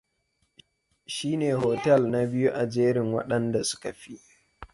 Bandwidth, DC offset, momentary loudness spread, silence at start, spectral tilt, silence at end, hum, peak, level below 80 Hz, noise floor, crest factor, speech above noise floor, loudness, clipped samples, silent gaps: 11.5 kHz; under 0.1%; 14 LU; 1.1 s; -5.5 dB/octave; 0.1 s; none; -8 dBFS; -60 dBFS; -74 dBFS; 18 dB; 48 dB; -26 LUFS; under 0.1%; none